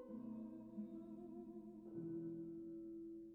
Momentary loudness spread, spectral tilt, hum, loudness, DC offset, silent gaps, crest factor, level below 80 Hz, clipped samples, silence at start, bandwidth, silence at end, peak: 6 LU; -11.5 dB/octave; none; -52 LUFS; under 0.1%; none; 12 dB; -80 dBFS; under 0.1%; 0 s; 3.6 kHz; 0 s; -40 dBFS